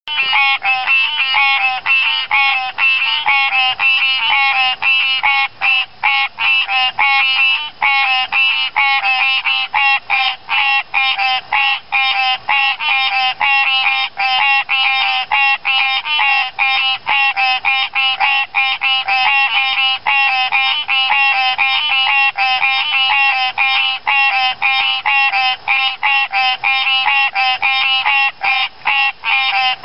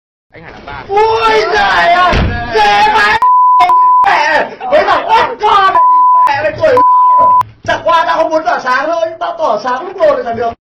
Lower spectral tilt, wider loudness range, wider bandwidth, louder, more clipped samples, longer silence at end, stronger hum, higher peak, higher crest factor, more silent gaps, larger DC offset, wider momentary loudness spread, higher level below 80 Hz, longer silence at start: second, -1 dB/octave vs -4.5 dB/octave; about the same, 1 LU vs 3 LU; second, 8.6 kHz vs 10 kHz; second, -12 LUFS vs -9 LUFS; neither; about the same, 0 s vs 0.05 s; neither; about the same, -2 dBFS vs 0 dBFS; about the same, 12 dB vs 10 dB; neither; first, 1% vs under 0.1%; second, 3 LU vs 8 LU; second, -60 dBFS vs -30 dBFS; second, 0.05 s vs 0.35 s